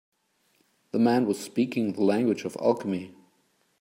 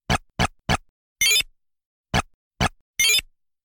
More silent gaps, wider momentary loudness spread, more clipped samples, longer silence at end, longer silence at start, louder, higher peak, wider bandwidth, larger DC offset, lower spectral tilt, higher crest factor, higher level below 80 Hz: second, none vs 0.89-1.16 s, 1.86-2.04 s, 2.34-2.51 s, 2.81-2.94 s; about the same, 10 LU vs 8 LU; neither; first, 0.7 s vs 0.4 s; first, 0.95 s vs 0.1 s; second, -26 LUFS vs -22 LUFS; about the same, -8 dBFS vs -8 dBFS; about the same, 16 kHz vs 17.5 kHz; neither; first, -6.5 dB/octave vs -2 dB/octave; about the same, 18 dB vs 18 dB; second, -76 dBFS vs -40 dBFS